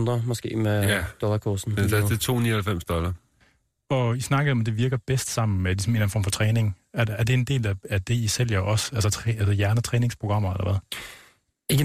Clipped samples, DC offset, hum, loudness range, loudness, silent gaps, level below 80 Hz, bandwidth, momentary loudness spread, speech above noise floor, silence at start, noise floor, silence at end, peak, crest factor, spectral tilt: under 0.1%; under 0.1%; none; 2 LU; -25 LUFS; none; -46 dBFS; 15.5 kHz; 5 LU; 40 dB; 0 s; -64 dBFS; 0 s; -10 dBFS; 14 dB; -5.5 dB/octave